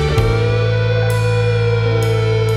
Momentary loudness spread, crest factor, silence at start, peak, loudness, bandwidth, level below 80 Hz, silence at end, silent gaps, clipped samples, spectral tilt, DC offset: 0 LU; 12 dB; 0 s; -2 dBFS; -16 LUFS; 13 kHz; -28 dBFS; 0 s; none; under 0.1%; -6.5 dB/octave; under 0.1%